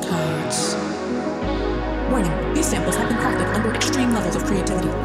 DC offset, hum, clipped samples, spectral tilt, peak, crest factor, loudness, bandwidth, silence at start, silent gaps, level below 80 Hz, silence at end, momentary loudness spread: under 0.1%; none; under 0.1%; -4.5 dB/octave; -8 dBFS; 14 dB; -22 LUFS; 15.5 kHz; 0 s; none; -32 dBFS; 0 s; 4 LU